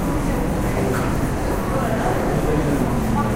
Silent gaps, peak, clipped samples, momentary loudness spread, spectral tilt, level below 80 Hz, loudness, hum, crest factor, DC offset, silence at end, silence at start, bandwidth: none; -6 dBFS; under 0.1%; 2 LU; -6.5 dB/octave; -28 dBFS; -21 LUFS; none; 12 dB; under 0.1%; 0 s; 0 s; 16 kHz